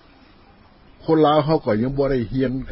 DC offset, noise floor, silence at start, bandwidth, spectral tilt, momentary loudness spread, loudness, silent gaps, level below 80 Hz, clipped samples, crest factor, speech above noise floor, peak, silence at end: under 0.1%; -50 dBFS; 1.05 s; 5.8 kHz; -12 dB/octave; 7 LU; -19 LUFS; none; -42 dBFS; under 0.1%; 16 dB; 31 dB; -4 dBFS; 0 s